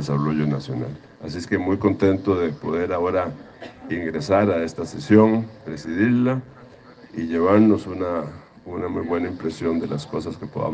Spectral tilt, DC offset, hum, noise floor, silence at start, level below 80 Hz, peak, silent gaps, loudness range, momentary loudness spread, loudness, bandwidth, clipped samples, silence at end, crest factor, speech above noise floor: -7.5 dB/octave; under 0.1%; none; -46 dBFS; 0 s; -56 dBFS; -2 dBFS; none; 3 LU; 17 LU; -22 LUFS; 9 kHz; under 0.1%; 0 s; 20 dB; 24 dB